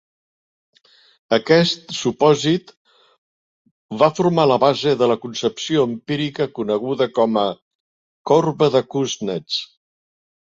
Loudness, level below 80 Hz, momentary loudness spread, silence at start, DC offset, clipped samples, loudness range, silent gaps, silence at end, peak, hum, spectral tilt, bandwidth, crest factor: -19 LUFS; -62 dBFS; 9 LU; 1.3 s; under 0.1%; under 0.1%; 2 LU; 2.77-2.85 s, 3.18-3.65 s, 3.71-3.89 s, 7.62-8.25 s; 0.8 s; -2 dBFS; none; -5.5 dB/octave; 7.8 kHz; 18 dB